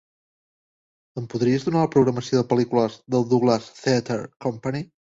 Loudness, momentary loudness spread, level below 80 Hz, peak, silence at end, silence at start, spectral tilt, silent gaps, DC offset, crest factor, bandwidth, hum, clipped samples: -23 LUFS; 10 LU; -60 dBFS; -6 dBFS; 0.3 s; 1.15 s; -6.5 dB/octave; 4.36-4.40 s; under 0.1%; 18 dB; 7.8 kHz; none; under 0.1%